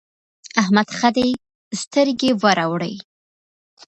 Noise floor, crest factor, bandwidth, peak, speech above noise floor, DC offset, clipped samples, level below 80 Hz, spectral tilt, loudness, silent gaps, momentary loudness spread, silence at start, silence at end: under -90 dBFS; 20 dB; 10.5 kHz; 0 dBFS; over 72 dB; under 0.1%; under 0.1%; -60 dBFS; -4.5 dB/octave; -19 LUFS; 1.55-1.71 s; 12 LU; 0.55 s; 0.85 s